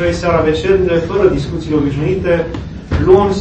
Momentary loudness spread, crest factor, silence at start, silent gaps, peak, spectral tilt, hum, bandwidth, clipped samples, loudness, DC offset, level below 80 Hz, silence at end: 9 LU; 14 dB; 0 s; none; 0 dBFS; -7.5 dB/octave; none; 8.6 kHz; 0.2%; -14 LUFS; under 0.1%; -28 dBFS; 0 s